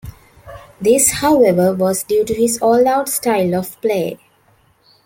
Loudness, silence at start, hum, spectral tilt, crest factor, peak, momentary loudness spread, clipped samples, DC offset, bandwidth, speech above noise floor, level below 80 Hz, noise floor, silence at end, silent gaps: -15 LUFS; 0.05 s; none; -4.5 dB/octave; 16 dB; 0 dBFS; 8 LU; under 0.1%; under 0.1%; 17 kHz; 40 dB; -46 dBFS; -55 dBFS; 0.9 s; none